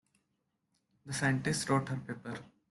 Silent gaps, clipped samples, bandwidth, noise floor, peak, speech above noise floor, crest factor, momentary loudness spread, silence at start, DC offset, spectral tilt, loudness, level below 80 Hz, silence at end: none; under 0.1%; 12 kHz; -82 dBFS; -16 dBFS; 48 dB; 20 dB; 13 LU; 1.05 s; under 0.1%; -5 dB/octave; -34 LUFS; -66 dBFS; 0.25 s